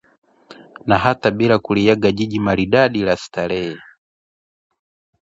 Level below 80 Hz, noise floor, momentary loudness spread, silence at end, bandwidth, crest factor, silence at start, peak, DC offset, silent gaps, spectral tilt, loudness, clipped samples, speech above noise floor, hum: -46 dBFS; -44 dBFS; 9 LU; 1.45 s; 7.8 kHz; 18 dB; 0.5 s; 0 dBFS; under 0.1%; none; -6.5 dB/octave; -17 LUFS; under 0.1%; 27 dB; none